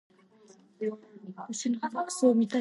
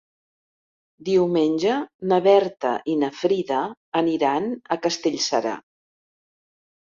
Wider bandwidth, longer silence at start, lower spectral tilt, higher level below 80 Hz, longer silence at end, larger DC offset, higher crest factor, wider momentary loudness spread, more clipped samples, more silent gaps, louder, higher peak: first, 11.5 kHz vs 7.6 kHz; second, 0.8 s vs 1 s; about the same, -4.5 dB/octave vs -5 dB/octave; second, -86 dBFS vs -68 dBFS; second, 0 s vs 1.3 s; neither; about the same, 18 dB vs 18 dB; first, 20 LU vs 8 LU; neither; second, none vs 1.94-1.99 s, 3.77-3.92 s; second, -30 LUFS vs -22 LUFS; second, -12 dBFS vs -4 dBFS